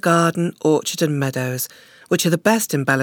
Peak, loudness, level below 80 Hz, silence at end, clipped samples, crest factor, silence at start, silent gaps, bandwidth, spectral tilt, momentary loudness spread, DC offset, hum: -2 dBFS; -19 LUFS; -68 dBFS; 0 s; under 0.1%; 18 dB; 0.05 s; none; 19.5 kHz; -4.5 dB/octave; 7 LU; under 0.1%; none